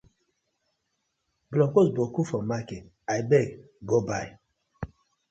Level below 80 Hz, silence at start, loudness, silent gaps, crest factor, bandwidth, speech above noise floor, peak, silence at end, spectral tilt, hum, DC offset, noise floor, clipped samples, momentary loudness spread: -58 dBFS; 1.5 s; -26 LUFS; none; 20 dB; 8.2 kHz; 53 dB; -8 dBFS; 0.45 s; -7 dB/octave; none; under 0.1%; -78 dBFS; under 0.1%; 19 LU